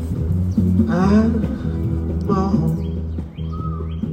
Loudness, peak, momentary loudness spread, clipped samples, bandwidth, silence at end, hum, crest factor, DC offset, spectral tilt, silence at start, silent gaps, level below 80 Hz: -20 LUFS; -4 dBFS; 11 LU; under 0.1%; 9 kHz; 0 s; none; 14 dB; under 0.1%; -9.5 dB/octave; 0 s; none; -32 dBFS